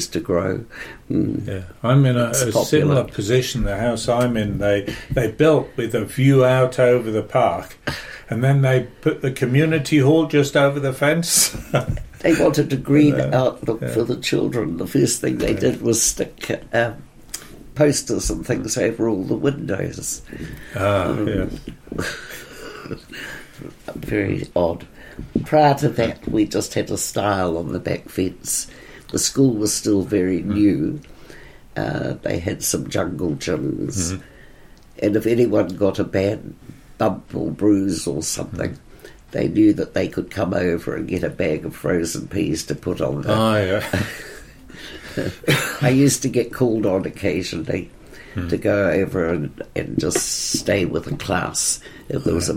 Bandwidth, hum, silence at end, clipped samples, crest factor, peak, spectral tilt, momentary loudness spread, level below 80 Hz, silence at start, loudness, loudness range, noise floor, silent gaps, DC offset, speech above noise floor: 16.5 kHz; none; 0 s; under 0.1%; 18 dB; -2 dBFS; -5 dB/octave; 14 LU; -42 dBFS; 0 s; -20 LUFS; 6 LU; -44 dBFS; none; under 0.1%; 25 dB